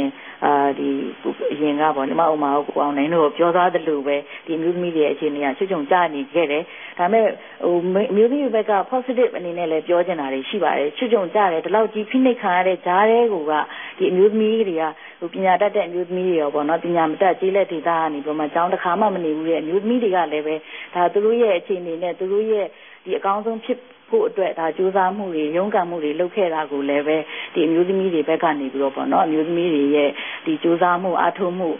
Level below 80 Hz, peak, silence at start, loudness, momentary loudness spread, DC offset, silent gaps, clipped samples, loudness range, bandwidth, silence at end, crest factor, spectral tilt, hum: -76 dBFS; -4 dBFS; 0 s; -20 LUFS; 7 LU; under 0.1%; none; under 0.1%; 3 LU; 3.7 kHz; 0 s; 16 dB; -10.5 dB/octave; none